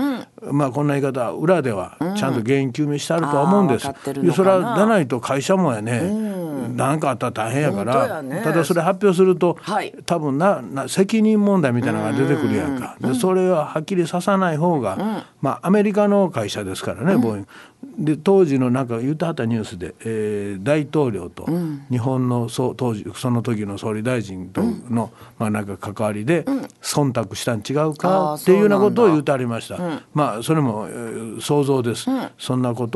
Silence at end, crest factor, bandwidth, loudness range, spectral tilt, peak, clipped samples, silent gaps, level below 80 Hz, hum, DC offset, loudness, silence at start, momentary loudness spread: 0 s; 18 dB; 12.5 kHz; 5 LU; -6.5 dB/octave; -2 dBFS; under 0.1%; none; -56 dBFS; none; under 0.1%; -20 LUFS; 0 s; 9 LU